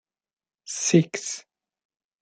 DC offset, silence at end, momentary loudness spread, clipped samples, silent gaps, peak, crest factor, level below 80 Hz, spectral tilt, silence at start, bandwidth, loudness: under 0.1%; 0.8 s; 14 LU; under 0.1%; none; -4 dBFS; 24 dB; -72 dBFS; -4.5 dB/octave; 0.65 s; 9.4 kHz; -24 LUFS